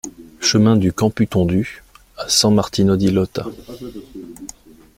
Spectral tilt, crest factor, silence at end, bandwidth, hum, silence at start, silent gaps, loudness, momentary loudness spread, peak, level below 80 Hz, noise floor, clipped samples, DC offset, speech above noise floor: -5 dB/octave; 16 dB; 0.5 s; 16.5 kHz; none; 0.05 s; none; -16 LUFS; 21 LU; -2 dBFS; -46 dBFS; -41 dBFS; under 0.1%; under 0.1%; 24 dB